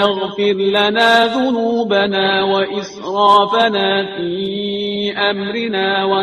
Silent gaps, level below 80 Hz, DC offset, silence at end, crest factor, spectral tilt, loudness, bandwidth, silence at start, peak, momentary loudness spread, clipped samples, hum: none; -58 dBFS; under 0.1%; 0 s; 14 dB; -5 dB/octave; -15 LUFS; 12.5 kHz; 0 s; 0 dBFS; 9 LU; under 0.1%; none